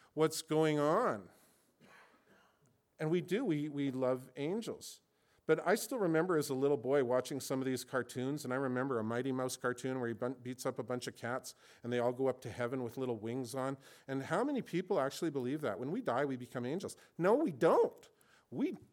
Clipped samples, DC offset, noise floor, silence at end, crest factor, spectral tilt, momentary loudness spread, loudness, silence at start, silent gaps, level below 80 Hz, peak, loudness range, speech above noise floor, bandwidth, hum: under 0.1%; under 0.1%; -73 dBFS; 0.15 s; 18 dB; -5.5 dB/octave; 9 LU; -36 LUFS; 0.15 s; none; -82 dBFS; -18 dBFS; 4 LU; 38 dB; 18 kHz; none